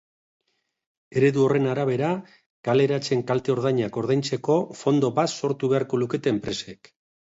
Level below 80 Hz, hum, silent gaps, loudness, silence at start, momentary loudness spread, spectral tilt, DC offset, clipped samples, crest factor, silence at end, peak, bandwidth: -62 dBFS; none; 2.46-2.63 s; -24 LUFS; 1.15 s; 7 LU; -6.5 dB/octave; under 0.1%; under 0.1%; 16 dB; 0.65 s; -8 dBFS; 8 kHz